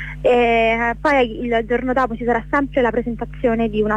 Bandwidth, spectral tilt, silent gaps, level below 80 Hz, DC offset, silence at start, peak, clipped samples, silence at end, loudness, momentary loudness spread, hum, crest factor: 9 kHz; -6.5 dB/octave; none; -36 dBFS; under 0.1%; 0 s; -6 dBFS; under 0.1%; 0 s; -18 LUFS; 6 LU; 50 Hz at -35 dBFS; 12 dB